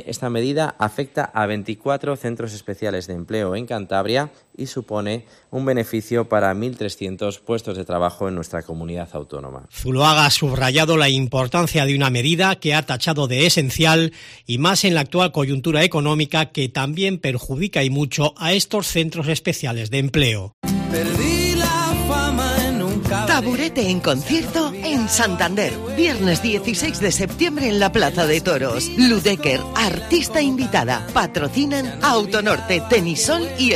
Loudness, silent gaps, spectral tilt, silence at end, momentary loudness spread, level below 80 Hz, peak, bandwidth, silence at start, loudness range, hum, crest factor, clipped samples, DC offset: -19 LUFS; 20.53-20.62 s; -4 dB/octave; 0 s; 11 LU; -40 dBFS; 0 dBFS; 15.5 kHz; 0 s; 7 LU; none; 20 dB; under 0.1%; under 0.1%